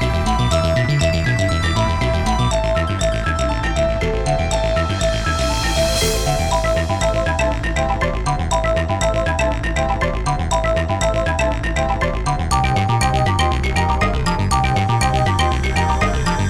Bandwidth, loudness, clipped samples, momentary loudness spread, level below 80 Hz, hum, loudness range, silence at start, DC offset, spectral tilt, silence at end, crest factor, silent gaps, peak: 18 kHz; -18 LUFS; under 0.1%; 3 LU; -24 dBFS; none; 2 LU; 0 s; 0.5%; -5 dB/octave; 0 s; 14 dB; none; -4 dBFS